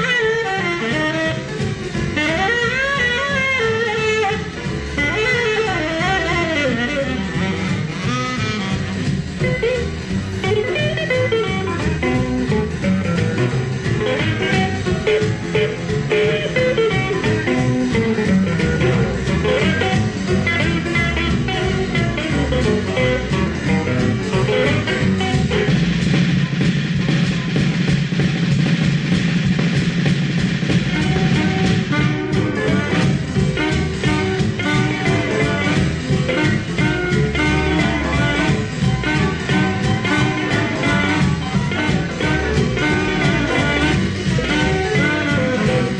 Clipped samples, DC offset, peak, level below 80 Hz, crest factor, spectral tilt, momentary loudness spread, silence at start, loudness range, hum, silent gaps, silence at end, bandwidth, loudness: under 0.1%; under 0.1%; -4 dBFS; -32 dBFS; 14 dB; -6 dB/octave; 4 LU; 0 s; 2 LU; none; none; 0 s; 9.8 kHz; -18 LUFS